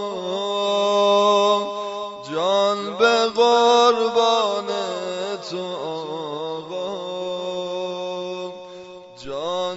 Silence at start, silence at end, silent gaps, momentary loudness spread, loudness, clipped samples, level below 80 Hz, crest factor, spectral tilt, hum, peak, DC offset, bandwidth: 0 s; 0 s; none; 14 LU; -21 LUFS; under 0.1%; -66 dBFS; 16 dB; -3.5 dB/octave; none; -4 dBFS; under 0.1%; 8 kHz